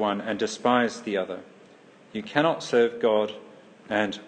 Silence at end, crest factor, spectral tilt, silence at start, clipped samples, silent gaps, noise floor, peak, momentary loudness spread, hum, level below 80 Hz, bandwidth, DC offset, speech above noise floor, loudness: 0 s; 22 dB; -4.5 dB/octave; 0 s; under 0.1%; none; -52 dBFS; -4 dBFS; 14 LU; none; -72 dBFS; 9.4 kHz; under 0.1%; 27 dB; -25 LUFS